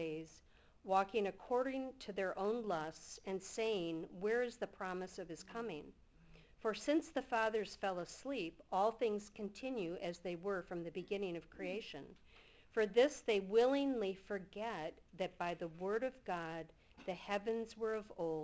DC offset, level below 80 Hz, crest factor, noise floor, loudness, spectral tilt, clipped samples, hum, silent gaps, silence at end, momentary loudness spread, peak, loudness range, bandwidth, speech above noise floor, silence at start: under 0.1%; -70 dBFS; 20 dB; -66 dBFS; -41 LUFS; -5 dB/octave; under 0.1%; none; none; 0 s; 13 LU; -22 dBFS; 6 LU; 8 kHz; 26 dB; 0 s